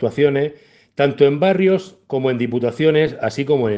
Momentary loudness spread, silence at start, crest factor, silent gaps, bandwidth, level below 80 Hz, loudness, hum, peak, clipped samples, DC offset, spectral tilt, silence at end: 8 LU; 0 s; 16 dB; none; 8 kHz; -58 dBFS; -18 LUFS; none; 0 dBFS; under 0.1%; under 0.1%; -7.5 dB/octave; 0 s